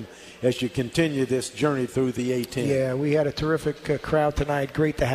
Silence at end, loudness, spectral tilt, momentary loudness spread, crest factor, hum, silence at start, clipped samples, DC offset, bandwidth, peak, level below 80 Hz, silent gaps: 0 s; -25 LUFS; -6 dB/octave; 4 LU; 16 dB; none; 0 s; under 0.1%; under 0.1%; 15.5 kHz; -8 dBFS; -44 dBFS; none